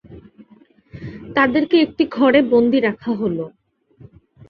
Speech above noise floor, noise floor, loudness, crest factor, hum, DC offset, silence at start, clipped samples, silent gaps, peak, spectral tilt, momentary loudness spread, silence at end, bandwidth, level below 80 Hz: 35 dB; -51 dBFS; -17 LUFS; 18 dB; none; under 0.1%; 0.1 s; under 0.1%; none; -2 dBFS; -8.5 dB/octave; 20 LU; 1 s; 5.8 kHz; -54 dBFS